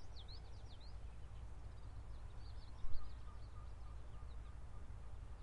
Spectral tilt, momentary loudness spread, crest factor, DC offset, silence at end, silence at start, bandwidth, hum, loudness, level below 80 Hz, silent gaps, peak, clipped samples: -6 dB/octave; 2 LU; 20 dB; under 0.1%; 0 s; 0 s; 10 kHz; none; -56 LUFS; -52 dBFS; none; -24 dBFS; under 0.1%